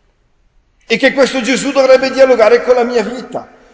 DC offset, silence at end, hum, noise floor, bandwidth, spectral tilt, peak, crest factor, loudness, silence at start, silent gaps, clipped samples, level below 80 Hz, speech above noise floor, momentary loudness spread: under 0.1%; 0.3 s; none; -55 dBFS; 8 kHz; -3.5 dB/octave; 0 dBFS; 12 dB; -11 LUFS; 0.9 s; none; 0.1%; -50 dBFS; 44 dB; 14 LU